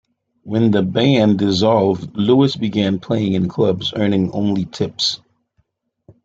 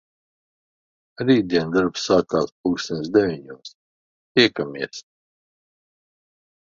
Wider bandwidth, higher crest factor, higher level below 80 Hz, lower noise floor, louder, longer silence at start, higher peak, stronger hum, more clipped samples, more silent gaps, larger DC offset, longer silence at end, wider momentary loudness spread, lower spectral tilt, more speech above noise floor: about the same, 7.8 kHz vs 7.6 kHz; about the same, 16 dB vs 20 dB; about the same, -56 dBFS vs -58 dBFS; second, -65 dBFS vs under -90 dBFS; first, -17 LUFS vs -21 LUFS; second, 0.45 s vs 1.2 s; about the same, -2 dBFS vs -4 dBFS; neither; neither; second, none vs 2.52-2.64 s, 3.75-4.35 s; neither; second, 1.1 s vs 1.65 s; second, 6 LU vs 15 LU; first, -6.5 dB/octave vs -5 dB/octave; second, 49 dB vs over 69 dB